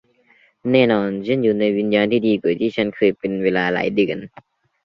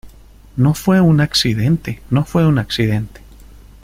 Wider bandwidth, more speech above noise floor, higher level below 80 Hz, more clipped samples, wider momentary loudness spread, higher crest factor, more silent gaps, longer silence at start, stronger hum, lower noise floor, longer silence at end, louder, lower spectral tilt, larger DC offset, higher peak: second, 6.2 kHz vs 16 kHz; first, 38 dB vs 27 dB; second, -58 dBFS vs -38 dBFS; neither; second, 5 LU vs 8 LU; about the same, 18 dB vs 14 dB; neither; first, 0.65 s vs 0.05 s; neither; first, -57 dBFS vs -41 dBFS; second, 0.55 s vs 0.75 s; second, -19 LUFS vs -15 LUFS; first, -8 dB/octave vs -6 dB/octave; neither; about the same, -2 dBFS vs -2 dBFS